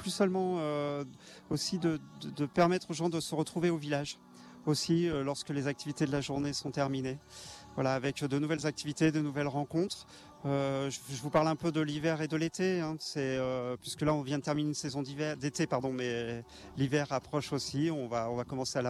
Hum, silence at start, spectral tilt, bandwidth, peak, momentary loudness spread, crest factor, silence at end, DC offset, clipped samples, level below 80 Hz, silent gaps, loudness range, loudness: none; 0 s; -5.5 dB/octave; 14 kHz; -14 dBFS; 9 LU; 18 dB; 0 s; under 0.1%; under 0.1%; -64 dBFS; none; 2 LU; -33 LUFS